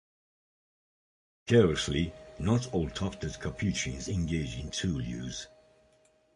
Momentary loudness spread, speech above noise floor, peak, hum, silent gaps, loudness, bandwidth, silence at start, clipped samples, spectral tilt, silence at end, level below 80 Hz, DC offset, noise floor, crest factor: 13 LU; 36 dB; -10 dBFS; none; none; -31 LUFS; 11.5 kHz; 1.45 s; under 0.1%; -5.5 dB/octave; 0.9 s; -46 dBFS; under 0.1%; -66 dBFS; 24 dB